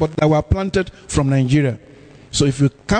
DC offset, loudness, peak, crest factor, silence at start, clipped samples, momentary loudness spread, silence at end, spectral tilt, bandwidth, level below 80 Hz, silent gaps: under 0.1%; -18 LUFS; -4 dBFS; 14 dB; 0 s; under 0.1%; 7 LU; 0 s; -6 dB/octave; 9.4 kHz; -34 dBFS; none